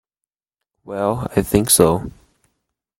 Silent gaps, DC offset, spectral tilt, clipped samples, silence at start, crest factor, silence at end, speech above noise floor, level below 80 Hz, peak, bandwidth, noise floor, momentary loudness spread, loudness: none; under 0.1%; -4.5 dB/octave; under 0.1%; 0.85 s; 20 dB; 0.9 s; 69 dB; -42 dBFS; 0 dBFS; 16.5 kHz; -86 dBFS; 16 LU; -17 LUFS